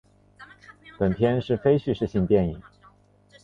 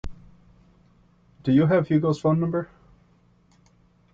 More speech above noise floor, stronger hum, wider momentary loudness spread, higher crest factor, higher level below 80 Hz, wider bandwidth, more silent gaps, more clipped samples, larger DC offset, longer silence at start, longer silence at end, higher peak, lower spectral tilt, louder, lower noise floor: second, 34 dB vs 39 dB; first, 50 Hz at -45 dBFS vs none; second, 6 LU vs 16 LU; about the same, 18 dB vs 16 dB; about the same, -46 dBFS vs -50 dBFS; about the same, 7 kHz vs 7.6 kHz; neither; neither; neither; first, 0.4 s vs 0.05 s; second, 0.85 s vs 1.5 s; about the same, -8 dBFS vs -10 dBFS; about the same, -9 dB/octave vs -9 dB/octave; about the same, -24 LUFS vs -22 LUFS; about the same, -57 dBFS vs -60 dBFS